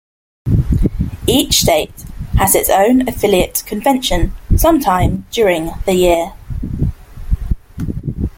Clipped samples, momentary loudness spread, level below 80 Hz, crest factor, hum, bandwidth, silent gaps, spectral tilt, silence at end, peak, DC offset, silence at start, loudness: under 0.1%; 13 LU; -22 dBFS; 14 dB; none; 17 kHz; none; -4.5 dB/octave; 0.1 s; 0 dBFS; under 0.1%; 0.45 s; -15 LUFS